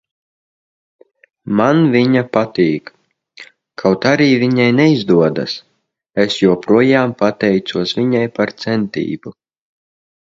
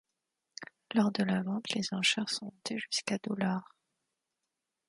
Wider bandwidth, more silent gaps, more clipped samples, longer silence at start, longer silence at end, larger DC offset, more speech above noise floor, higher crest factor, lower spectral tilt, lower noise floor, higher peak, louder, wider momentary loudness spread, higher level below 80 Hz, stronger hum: second, 7.8 kHz vs 11.5 kHz; neither; neither; first, 1.45 s vs 0.6 s; second, 0.95 s vs 1.25 s; neither; second, 39 dB vs 54 dB; second, 16 dB vs 22 dB; first, -6.5 dB/octave vs -4 dB/octave; second, -53 dBFS vs -87 dBFS; first, 0 dBFS vs -14 dBFS; first, -14 LUFS vs -32 LUFS; second, 12 LU vs 16 LU; first, -56 dBFS vs -76 dBFS; neither